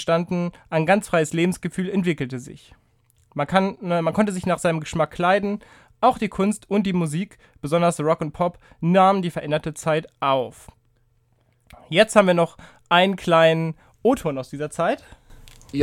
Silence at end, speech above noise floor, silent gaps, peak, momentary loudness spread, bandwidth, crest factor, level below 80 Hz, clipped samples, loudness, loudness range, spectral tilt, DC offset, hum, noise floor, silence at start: 0 s; 42 dB; none; 0 dBFS; 13 LU; 15 kHz; 22 dB; -54 dBFS; under 0.1%; -21 LUFS; 4 LU; -5.5 dB/octave; under 0.1%; none; -63 dBFS; 0 s